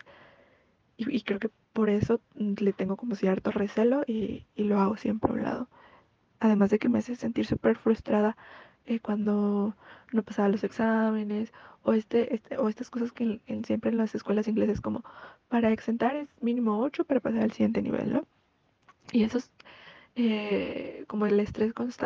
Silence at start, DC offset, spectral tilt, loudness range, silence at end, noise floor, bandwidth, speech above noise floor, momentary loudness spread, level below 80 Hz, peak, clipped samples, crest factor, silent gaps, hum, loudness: 1 s; under 0.1%; -8 dB/octave; 3 LU; 0 s; -69 dBFS; 7.2 kHz; 41 dB; 9 LU; -58 dBFS; -8 dBFS; under 0.1%; 20 dB; none; none; -29 LUFS